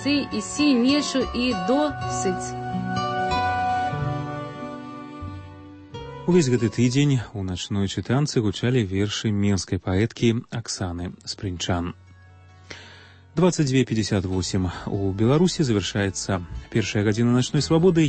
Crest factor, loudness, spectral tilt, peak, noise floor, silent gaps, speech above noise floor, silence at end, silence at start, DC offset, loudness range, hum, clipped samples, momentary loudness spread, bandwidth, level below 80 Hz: 16 dB; -23 LUFS; -5.5 dB/octave; -8 dBFS; -48 dBFS; none; 26 dB; 0 s; 0 s; under 0.1%; 5 LU; none; under 0.1%; 15 LU; 8.8 kHz; -46 dBFS